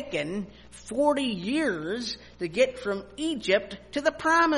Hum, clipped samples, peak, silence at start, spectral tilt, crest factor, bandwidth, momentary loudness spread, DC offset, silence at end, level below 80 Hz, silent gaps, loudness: 60 Hz at -55 dBFS; under 0.1%; -8 dBFS; 0 s; -4 dB/octave; 20 dB; 11.5 kHz; 10 LU; under 0.1%; 0 s; -56 dBFS; none; -28 LUFS